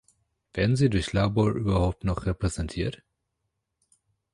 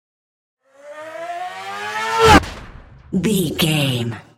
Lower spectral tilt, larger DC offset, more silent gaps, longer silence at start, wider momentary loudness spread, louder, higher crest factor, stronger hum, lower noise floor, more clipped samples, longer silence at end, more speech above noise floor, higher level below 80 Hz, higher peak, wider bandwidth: first, -6.5 dB/octave vs -4.5 dB/octave; neither; neither; second, 0.55 s vs 0.85 s; second, 8 LU vs 22 LU; second, -26 LUFS vs -17 LUFS; about the same, 18 dB vs 20 dB; neither; first, -80 dBFS vs -40 dBFS; neither; first, 1.4 s vs 0.15 s; first, 55 dB vs 20 dB; about the same, -40 dBFS vs -36 dBFS; second, -10 dBFS vs 0 dBFS; second, 11 kHz vs 16.5 kHz